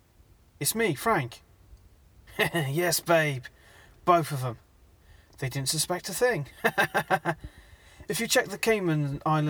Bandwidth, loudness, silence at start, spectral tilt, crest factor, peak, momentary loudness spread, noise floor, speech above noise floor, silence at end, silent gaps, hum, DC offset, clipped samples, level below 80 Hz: over 20 kHz; -27 LUFS; 0.6 s; -4 dB/octave; 22 dB; -8 dBFS; 12 LU; -59 dBFS; 32 dB; 0 s; none; none; under 0.1%; under 0.1%; -56 dBFS